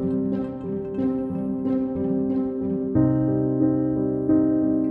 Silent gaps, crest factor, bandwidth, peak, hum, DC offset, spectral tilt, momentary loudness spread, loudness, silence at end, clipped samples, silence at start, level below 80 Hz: none; 14 dB; 3.1 kHz; -10 dBFS; none; under 0.1%; -12.5 dB/octave; 6 LU; -23 LUFS; 0 s; under 0.1%; 0 s; -48 dBFS